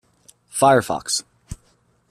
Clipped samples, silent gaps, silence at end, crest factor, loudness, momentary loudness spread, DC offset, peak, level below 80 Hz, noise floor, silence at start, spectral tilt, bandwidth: under 0.1%; none; 0.55 s; 20 dB; -19 LUFS; 24 LU; under 0.1%; -2 dBFS; -50 dBFS; -61 dBFS; 0.55 s; -3.5 dB/octave; 14.5 kHz